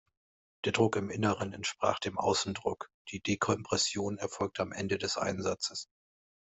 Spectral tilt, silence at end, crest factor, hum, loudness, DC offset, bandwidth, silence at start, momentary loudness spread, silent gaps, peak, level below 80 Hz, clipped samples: -4 dB/octave; 0.75 s; 20 dB; none; -32 LUFS; under 0.1%; 8.2 kHz; 0.65 s; 8 LU; 2.94-3.05 s; -12 dBFS; -68 dBFS; under 0.1%